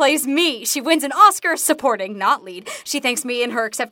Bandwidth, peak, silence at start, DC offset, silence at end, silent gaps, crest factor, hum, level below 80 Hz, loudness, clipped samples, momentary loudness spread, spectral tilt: 17 kHz; 0 dBFS; 0 s; under 0.1%; 0.05 s; none; 18 dB; none; -72 dBFS; -18 LUFS; under 0.1%; 10 LU; -1 dB/octave